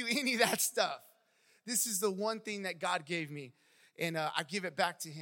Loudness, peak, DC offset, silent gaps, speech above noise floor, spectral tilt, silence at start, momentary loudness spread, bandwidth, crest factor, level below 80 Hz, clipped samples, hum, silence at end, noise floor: -34 LUFS; -12 dBFS; under 0.1%; none; 35 dB; -2.5 dB/octave; 0 s; 13 LU; 17 kHz; 24 dB; under -90 dBFS; under 0.1%; none; 0 s; -70 dBFS